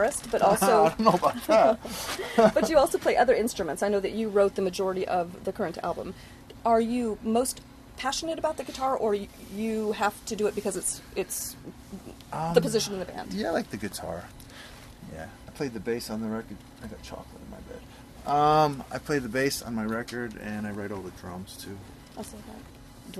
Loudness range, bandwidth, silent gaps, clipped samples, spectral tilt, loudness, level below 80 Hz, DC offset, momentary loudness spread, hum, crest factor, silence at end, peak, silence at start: 12 LU; 13.5 kHz; none; under 0.1%; -4.5 dB/octave; -27 LUFS; -52 dBFS; under 0.1%; 22 LU; none; 24 dB; 0 s; -4 dBFS; 0 s